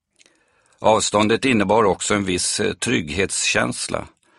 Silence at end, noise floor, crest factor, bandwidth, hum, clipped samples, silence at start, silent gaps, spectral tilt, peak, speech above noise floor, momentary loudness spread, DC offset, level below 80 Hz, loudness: 0.3 s; -60 dBFS; 18 dB; 11.5 kHz; none; under 0.1%; 0.8 s; none; -3.5 dB/octave; -2 dBFS; 41 dB; 6 LU; under 0.1%; -48 dBFS; -19 LUFS